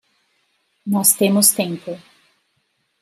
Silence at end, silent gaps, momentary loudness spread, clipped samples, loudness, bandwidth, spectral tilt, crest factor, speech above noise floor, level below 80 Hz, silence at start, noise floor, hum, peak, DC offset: 1.05 s; none; 21 LU; under 0.1%; -15 LUFS; 16 kHz; -3.5 dB/octave; 20 dB; 51 dB; -72 dBFS; 0.85 s; -68 dBFS; none; 0 dBFS; under 0.1%